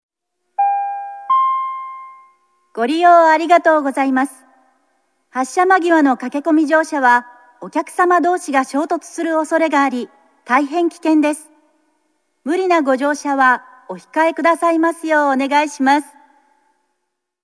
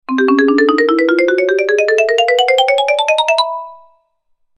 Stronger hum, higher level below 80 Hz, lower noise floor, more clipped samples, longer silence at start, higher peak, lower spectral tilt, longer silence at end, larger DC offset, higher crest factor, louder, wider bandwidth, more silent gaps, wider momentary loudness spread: neither; second, -82 dBFS vs -66 dBFS; first, -75 dBFS vs -63 dBFS; neither; first, 0.6 s vs 0.1 s; about the same, 0 dBFS vs 0 dBFS; first, -3 dB/octave vs -1.5 dB/octave; first, 1.4 s vs 0.8 s; neither; about the same, 16 dB vs 12 dB; second, -16 LUFS vs -12 LUFS; second, 11 kHz vs 12.5 kHz; neither; first, 13 LU vs 3 LU